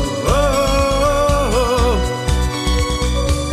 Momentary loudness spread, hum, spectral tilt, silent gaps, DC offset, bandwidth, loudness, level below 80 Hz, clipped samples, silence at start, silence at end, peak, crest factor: 4 LU; none; -5 dB/octave; none; under 0.1%; 15 kHz; -17 LUFS; -20 dBFS; under 0.1%; 0 s; 0 s; -2 dBFS; 12 dB